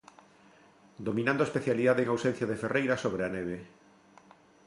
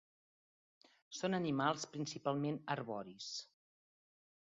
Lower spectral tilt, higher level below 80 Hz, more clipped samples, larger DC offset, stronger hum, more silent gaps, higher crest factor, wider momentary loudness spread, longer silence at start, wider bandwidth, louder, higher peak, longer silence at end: first, -6.5 dB/octave vs -4.5 dB/octave; first, -64 dBFS vs -82 dBFS; neither; neither; neither; neither; about the same, 18 dB vs 22 dB; about the same, 11 LU vs 10 LU; about the same, 1 s vs 1.1 s; first, 11.5 kHz vs 7.4 kHz; first, -30 LUFS vs -40 LUFS; first, -14 dBFS vs -20 dBFS; about the same, 1 s vs 0.95 s